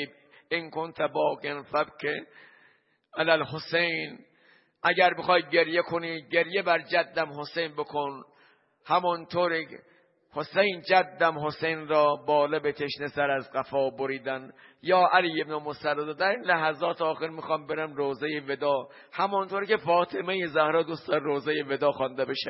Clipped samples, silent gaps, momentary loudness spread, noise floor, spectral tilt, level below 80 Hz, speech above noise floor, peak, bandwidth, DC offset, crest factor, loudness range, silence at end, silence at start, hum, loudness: under 0.1%; none; 10 LU; -64 dBFS; -8.5 dB/octave; -74 dBFS; 37 dB; -6 dBFS; 5.8 kHz; under 0.1%; 22 dB; 4 LU; 0 s; 0 s; none; -27 LUFS